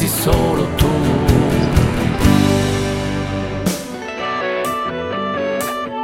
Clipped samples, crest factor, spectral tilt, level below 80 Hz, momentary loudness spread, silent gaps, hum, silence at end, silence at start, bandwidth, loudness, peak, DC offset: under 0.1%; 16 dB; -5.5 dB/octave; -26 dBFS; 8 LU; none; none; 0 s; 0 s; 16.5 kHz; -17 LUFS; 0 dBFS; under 0.1%